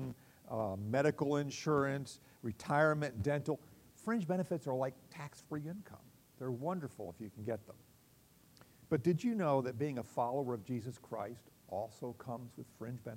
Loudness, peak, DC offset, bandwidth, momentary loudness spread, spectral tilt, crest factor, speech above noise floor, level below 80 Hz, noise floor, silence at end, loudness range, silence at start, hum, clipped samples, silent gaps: -38 LUFS; -18 dBFS; under 0.1%; 16 kHz; 15 LU; -7 dB/octave; 20 dB; 28 dB; -72 dBFS; -66 dBFS; 0 s; 9 LU; 0 s; none; under 0.1%; none